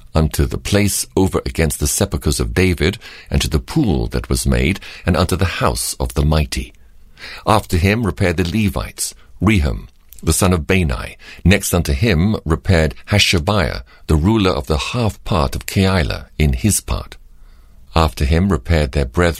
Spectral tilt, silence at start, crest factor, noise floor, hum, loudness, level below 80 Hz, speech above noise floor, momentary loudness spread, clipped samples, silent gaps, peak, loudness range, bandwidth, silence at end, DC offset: -5 dB/octave; 0.15 s; 16 dB; -41 dBFS; none; -17 LUFS; -26 dBFS; 25 dB; 8 LU; under 0.1%; none; 0 dBFS; 3 LU; 16 kHz; 0 s; under 0.1%